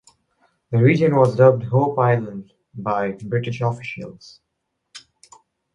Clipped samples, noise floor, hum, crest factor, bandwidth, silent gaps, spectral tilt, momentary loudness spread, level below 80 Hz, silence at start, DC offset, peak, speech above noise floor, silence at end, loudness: under 0.1%; -76 dBFS; none; 20 dB; 9.6 kHz; none; -8.5 dB/octave; 19 LU; -58 dBFS; 0.7 s; under 0.1%; -2 dBFS; 58 dB; 0.75 s; -19 LUFS